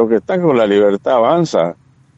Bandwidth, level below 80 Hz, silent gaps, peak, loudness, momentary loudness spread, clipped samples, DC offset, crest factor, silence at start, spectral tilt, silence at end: 8.2 kHz; -58 dBFS; none; -2 dBFS; -14 LUFS; 5 LU; under 0.1%; under 0.1%; 12 dB; 0 s; -6.5 dB/octave; 0.45 s